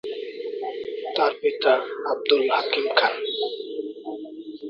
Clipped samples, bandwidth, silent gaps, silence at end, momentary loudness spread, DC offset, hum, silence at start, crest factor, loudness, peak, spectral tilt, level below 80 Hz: under 0.1%; 5.8 kHz; none; 0 s; 13 LU; under 0.1%; none; 0.05 s; 22 dB; -24 LUFS; -2 dBFS; -4 dB/octave; -74 dBFS